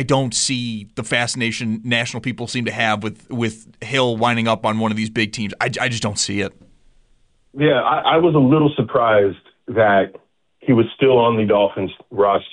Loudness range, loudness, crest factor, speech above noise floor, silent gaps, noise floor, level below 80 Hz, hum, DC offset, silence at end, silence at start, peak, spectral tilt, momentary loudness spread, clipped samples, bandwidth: 5 LU; -18 LUFS; 14 dB; 39 dB; none; -57 dBFS; -54 dBFS; none; under 0.1%; 0.05 s; 0 s; -4 dBFS; -4.5 dB/octave; 11 LU; under 0.1%; 10.5 kHz